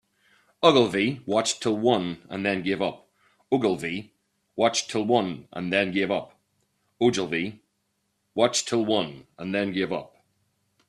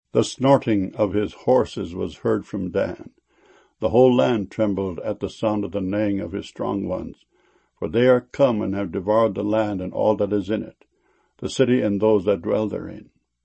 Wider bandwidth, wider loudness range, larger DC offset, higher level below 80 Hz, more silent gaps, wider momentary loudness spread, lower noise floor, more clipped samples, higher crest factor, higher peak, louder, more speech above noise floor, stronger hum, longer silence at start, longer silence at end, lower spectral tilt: first, 12.5 kHz vs 8.8 kHz; about the same, 3 LU vs 3 LU; neither; second, -66 dBFS vs -52 dBFS; neither; about the same, 11 LU vs 11 LU; first, -75 dBFS vs -65 dBFS; neither; about the same, 22 dB vs 20 dB; about the same, -4 dBFS vs -2 dBFS; second, -25 LUFS vs -22 LUFS; first, 50 dB vs 44 dB; neither; first, 0.6 s vs 0.15 s; first, 0.85 s vs 0.4 s; second, -4 dB/octave vs -7 dB/octave